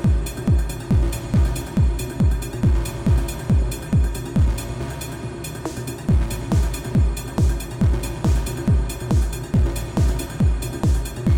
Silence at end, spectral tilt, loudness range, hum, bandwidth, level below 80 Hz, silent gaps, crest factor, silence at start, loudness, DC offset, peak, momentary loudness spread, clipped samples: 0 s; -6.5 dB/octave; 2 LU; none; 18 kHz; -24 dBFS; none; 14 dB; 0 s; -22 LUFS; under 0.1%; -6 dBFS; 7 LU; under 0.1%